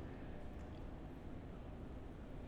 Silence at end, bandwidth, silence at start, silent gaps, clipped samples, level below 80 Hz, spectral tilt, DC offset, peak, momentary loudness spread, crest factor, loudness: 0 s; 11 kHz; 0 s; none; under 0.1%; -54 dBFS; -8 dB/octave; under 0.1%; -38 dBFS; 1 LU; 12 dB; -53 LUFS